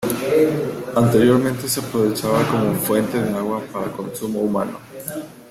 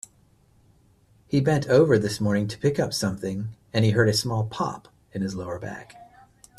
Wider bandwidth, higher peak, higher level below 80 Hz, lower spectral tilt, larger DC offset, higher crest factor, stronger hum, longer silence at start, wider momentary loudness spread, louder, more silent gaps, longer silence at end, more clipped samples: first, 16.5 kHz vs 14 kHz; about the same, -4 dBFS vs -6 dBFS; about the same, -54 dBFS vs -56 dBFS; about the same, -5.5 dB/octave vs -6 dB/octave; neither; about the same, 16 dB vs 20 dB; neither; second, 0 s vs 1.3 s; about the same, 13 LU vs 15 LU; first, -20 LUFS vs -24 LUFS; neither; second, 0.05 s vs 0.55 s; neither